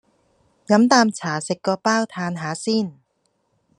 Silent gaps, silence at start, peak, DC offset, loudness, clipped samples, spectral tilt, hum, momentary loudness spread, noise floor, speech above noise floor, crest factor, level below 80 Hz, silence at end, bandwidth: none; 0.7 s; -2 dBFS; under 0.1%; -20 LUFS; under 0.1%; -4.5 dB/octave; none; 11 LU; -69 dBFS; 49 dB; 20 dB; -70 dBFS; 0.85 s; 11 kHz